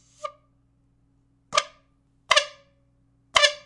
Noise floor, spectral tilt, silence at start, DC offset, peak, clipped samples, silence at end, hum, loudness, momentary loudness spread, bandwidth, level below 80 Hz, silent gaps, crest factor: -64 dBFS; 1.5 dB/octave; 0.25 s; under 0.1%; 0 dBFS; under 0.1%; 0.05 s; none; -22 LUFS; 20 LU; 11.5 kHz; -62 dBFS; none; 28 dB